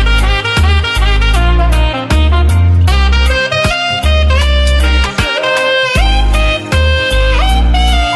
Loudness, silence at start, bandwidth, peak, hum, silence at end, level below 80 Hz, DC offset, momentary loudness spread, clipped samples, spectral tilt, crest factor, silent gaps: -11 LUFS; 0 s; 12 kHz; 0 dBFS; none; 0 s; -12 dBFS; under 0.1%; 2 LU; under 0.1%; -5 dB/octave; 8 dB; none